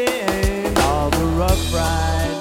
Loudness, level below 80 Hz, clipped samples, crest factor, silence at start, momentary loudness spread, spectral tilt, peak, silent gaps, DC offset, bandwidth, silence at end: -19 LUFS; -24 dBFS; under 0.1%; 16 dB; 0 s; 2 LU; -5 dB/octave; -2 dBFS; none; under 0.1%; 17.5 kHz; 0 s